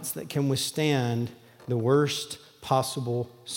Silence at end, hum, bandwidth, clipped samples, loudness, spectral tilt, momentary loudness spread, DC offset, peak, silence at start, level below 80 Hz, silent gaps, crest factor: 0 s; none; 17 kHz; under 0.1%; -27 LUFS; -5 dB/octave; 12 LU; under 0.1%; -10 dBFS; 0 s; -68 dBFS; none; 18 dB